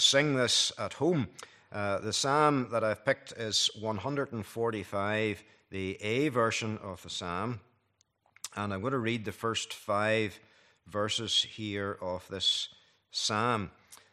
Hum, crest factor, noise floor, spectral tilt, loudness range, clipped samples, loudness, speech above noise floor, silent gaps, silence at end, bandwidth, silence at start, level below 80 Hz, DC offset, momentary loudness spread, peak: none; 22 dB; -74 dBFS; -3.5 dB/octave; 5 LU; under 0.1%; -31 LUFS; 42 dB; none; 0.15 s; 14.5 kHz; 0 s; -72 dBFS; under 0.1%; 12 LU; -10 dBFS